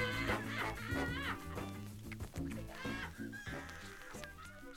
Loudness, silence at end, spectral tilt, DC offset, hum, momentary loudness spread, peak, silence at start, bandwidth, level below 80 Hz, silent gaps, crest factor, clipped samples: -43 LUFS; 0 s; -5 dB/octave; under 0.1%; none; 12 LU; -22 dBFS; 0 s; 17.5 kHz; -54 dBFS; none; 20 dB; under 0.1%